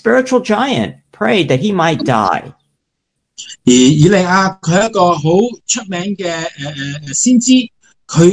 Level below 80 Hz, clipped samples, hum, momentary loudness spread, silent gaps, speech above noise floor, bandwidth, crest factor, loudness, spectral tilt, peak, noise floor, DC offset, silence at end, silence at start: -50 dBFS; 0.2%; none; 13 LU; none; 59 dB; 10.5 kHz; 14 dB; -13 LUFS; -4.5 dB/octave; 0 dBFS; -72 dBFS; under 0.1%; 0 s; 0.05 s